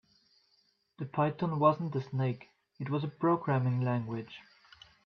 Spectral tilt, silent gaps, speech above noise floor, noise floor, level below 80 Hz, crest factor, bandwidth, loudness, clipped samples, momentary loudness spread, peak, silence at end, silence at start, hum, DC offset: -10 dB/octave; none; 41 dB; -73 dBFS; -74 dBFS; 20 dB; 6 kHz; -32 LUFS; under 0.1%; 16 LU; -12 dBFS; 0.65 s; 1 s; none; under 0.1%